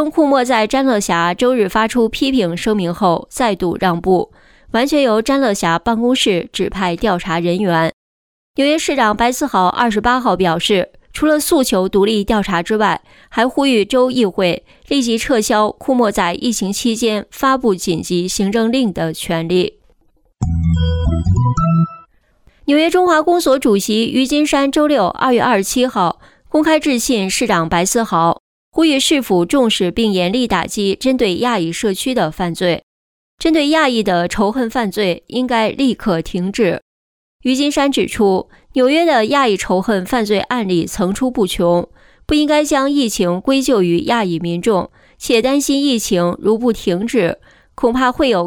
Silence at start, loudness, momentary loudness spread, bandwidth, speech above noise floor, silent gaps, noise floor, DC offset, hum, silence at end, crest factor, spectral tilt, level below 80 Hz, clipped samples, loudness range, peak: 0 s; -15 LUFS; 5 LU; 19 kHz; 41 dB; 7.93-8.54 s, 28.40-28.72 s, 32.83-33.38 s, 36.82-37.39 s; -55 dBFS; under 0.1%; none; 0 s; 12 dB; -4.5 dB/octave; -36 dBFS; under 0.1%; 3 LU; -2 dBFS